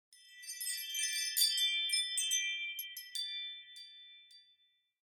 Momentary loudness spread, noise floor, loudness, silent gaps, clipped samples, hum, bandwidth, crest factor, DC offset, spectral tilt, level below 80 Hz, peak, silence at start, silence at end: 21 LU; -74 dBFS; -34 LUFS; none; under 0.1%; none; 19.5 kHz; 20 dB; under 0.1%; 8.5 dB/octave; under -90 dBFS; -18 dBFS; 0.1 s; 0.7 s